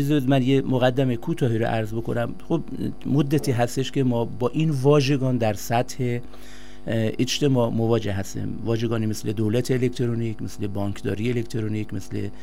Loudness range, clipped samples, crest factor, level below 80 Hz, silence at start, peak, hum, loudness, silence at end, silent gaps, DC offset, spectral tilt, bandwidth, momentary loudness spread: 3 LU; under 0.1%; 16 dB; -48 dBFS; 0 s; -6 dBFS; none; -24 LUFS; 0 s; none; 2%; -6.5 dB/octave; 16 kHz; 10 LU